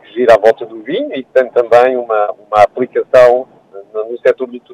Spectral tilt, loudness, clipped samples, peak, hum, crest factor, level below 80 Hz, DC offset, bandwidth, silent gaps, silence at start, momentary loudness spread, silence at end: -5.5 dB/octave; -12 LUFS; 0.7%; 0 dBFS; none; 12 dB; -52 dBFS; under 0.1%; 10.5 kHz; none; 0.15 s; 12 LU; 0 s